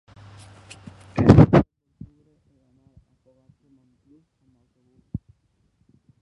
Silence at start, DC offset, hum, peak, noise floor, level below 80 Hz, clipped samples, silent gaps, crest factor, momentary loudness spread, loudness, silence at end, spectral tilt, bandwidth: 1.15 s; under 0.1%; none; 0 dBFS; -67 dBFS; -38 dBFS; under 0.1%; none; 24 dB; 30 LU; -16 LUFS; 1.05 s; -9 dB/octave; 10 kHz